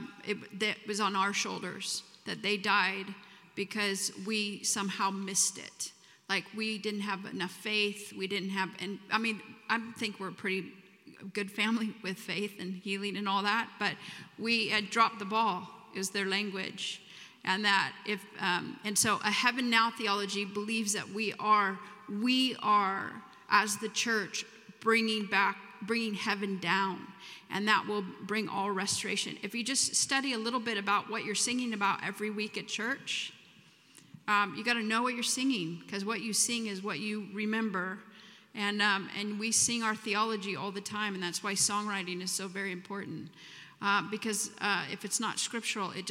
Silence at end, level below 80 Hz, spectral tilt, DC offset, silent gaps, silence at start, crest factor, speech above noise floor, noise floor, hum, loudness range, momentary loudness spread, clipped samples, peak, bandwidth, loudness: 0 s; -84 dBFS; -2 dB/octave; under 0.1%; none; 0 s; 22 dB; 27 dB; -60 dBFS; none; 4 LU; 11 LU; under 0.1%; -10 dBFS; 16.5 kHz; -32 LUFS